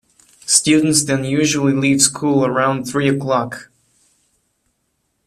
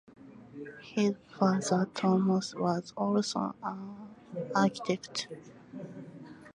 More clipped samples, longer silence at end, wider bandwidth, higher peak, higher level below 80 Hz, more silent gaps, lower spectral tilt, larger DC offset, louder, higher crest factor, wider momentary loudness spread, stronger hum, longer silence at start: neither; first, 1.65 s vs 0.05 s; first, 14 kHz vs 11 kHz; first, 0 dBFS vs -12 dBFS; first, -56 dBFS vs -74 dBFS; neither; second, -3.5 dB/octave vs -5.5 dB/octave; neither; first, -15 LUFS vs -31 LUFS; about the same, 18 dB vs 20 dB; second, 7 LU vs 20 LU; neither; first, 0.45 s vs 0.2 s